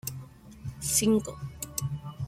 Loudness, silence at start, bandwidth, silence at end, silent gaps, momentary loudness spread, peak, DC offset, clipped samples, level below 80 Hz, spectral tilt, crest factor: -29 LUFS; 0.05 s; 16.5 kHz; 0 s; none; 20 LU; -12 dBFS; under 0.1%; under 0.1%; -52 dBFS; -4.5 dB/octave; 20 dB